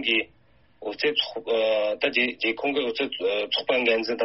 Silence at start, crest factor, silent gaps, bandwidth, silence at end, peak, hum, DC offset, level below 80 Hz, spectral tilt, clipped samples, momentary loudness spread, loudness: 0 s; 18 dB; none; 6 kHz; 0 s; -8 dBFS; none; under 0.1%; -66 dBFS; 0.5 dB/octave; under 0.1%; 5 LU; -24 LUFS